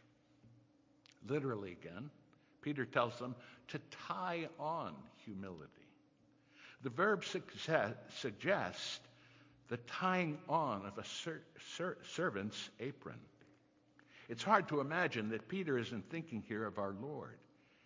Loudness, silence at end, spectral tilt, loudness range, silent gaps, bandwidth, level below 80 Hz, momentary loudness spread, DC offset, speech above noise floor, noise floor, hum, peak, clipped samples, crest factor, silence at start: -41 LUFS; 0.45 s; -5 dB/octave; 6 LU; none; 7.6 kHz; -76 dBFS; 16 LU; under 0.1%; 30 dB; -71 dBFS; none; -16 dBFS; under 0.1%; 26 dB; 0.45 s